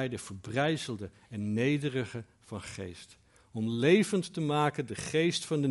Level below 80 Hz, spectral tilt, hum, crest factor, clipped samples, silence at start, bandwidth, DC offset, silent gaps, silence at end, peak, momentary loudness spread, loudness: -66 dBFS; -5.5 dB/octave; none; 20 dB; under 0.1%; 0 s; 11.5 kHz; under 0.1%; none; 0 s; -12 dBFS; 17 LU; -31 LUFS